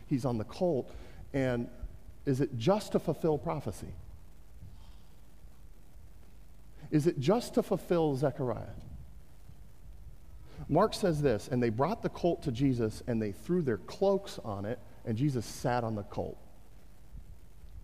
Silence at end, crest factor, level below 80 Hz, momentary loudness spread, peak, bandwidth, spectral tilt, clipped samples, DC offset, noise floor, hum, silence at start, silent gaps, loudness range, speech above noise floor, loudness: 0 s; 18 dB; -52 dBFS; 20 LU; -14 dBFS; 15.5 kHz; -7 dB/octave; under 0.1%; 0.4%; -56 dBFS; none; 0 s; none; 6 LU; 25 dB; -32 LUFS